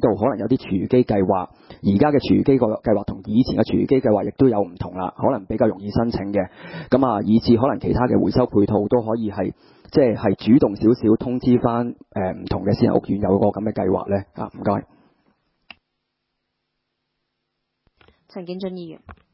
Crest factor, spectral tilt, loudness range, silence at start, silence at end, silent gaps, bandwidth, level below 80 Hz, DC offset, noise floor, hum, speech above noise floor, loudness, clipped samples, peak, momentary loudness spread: 18 dB; -12.5 dB/octave; 9 LU; 0 s; 0.2 s; none; 5.8 kHz; -44 dBFS; under 0.1%; -77 dBFS; none; 57 dB; -20 LUFS; under 0.1%; -2 dBFS; 11 LU